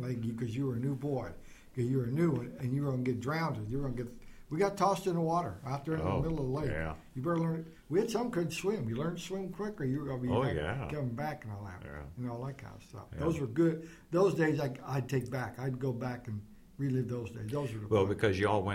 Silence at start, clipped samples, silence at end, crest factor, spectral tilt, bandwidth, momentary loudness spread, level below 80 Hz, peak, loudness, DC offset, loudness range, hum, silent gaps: 0 s; under 0.1%; 0 s; 18 dB; -7 dB/octave; 16 kHz; 12 LU; -54 dBFS; -16 dBFS; -34 LUFS; under 0.1%; 3 LU; none; none